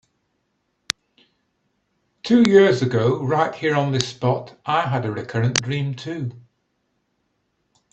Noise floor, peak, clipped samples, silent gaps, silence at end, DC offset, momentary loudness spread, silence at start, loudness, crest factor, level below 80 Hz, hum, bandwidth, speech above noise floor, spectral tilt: -71 dBFS; 0 dBFS; under 0.1%; none; 1.55 s; under 0.1%; 14 LU; 2.25 s; -20 LUFS; 22 dB; -60 dBFS; none; 11.5 kHz; 52 dB; -5.5 dB/octave